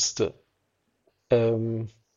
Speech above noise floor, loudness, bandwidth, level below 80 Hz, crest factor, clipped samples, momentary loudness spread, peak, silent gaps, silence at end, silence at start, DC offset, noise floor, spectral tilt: 49 dB; -26 LUFS; 7.8 kHz; -60 dBFS; 18 dB; under 0.1%; 8 LU; -10 dBFS; none; 0.25 s; 0 s; under 0.1%; -74 dBFS; -4.5 dB/octave